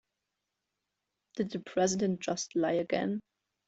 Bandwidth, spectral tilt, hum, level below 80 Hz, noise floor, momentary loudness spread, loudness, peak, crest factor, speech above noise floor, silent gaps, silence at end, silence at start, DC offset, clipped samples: 8.2 kHz; -4.5 dB/octave; none; -72 dBFS; -86 dBFS; 8 LU; -32 LUFS; -16 dBFS; 18 dB; 55 dB; none; 0.45 s; 1.35 s; under 0.1%; under 0.1%